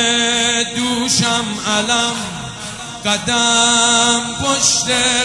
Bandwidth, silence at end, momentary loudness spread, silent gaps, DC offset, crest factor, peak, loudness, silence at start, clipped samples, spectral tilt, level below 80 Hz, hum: 11.5 kHz; 0 s; 13 LU; none; under 0.1%; 16 dB; 0 dBFS; -14 LUFS; 0 s; under 0.1%; -1.5 dB/octave; -46 dBFS; none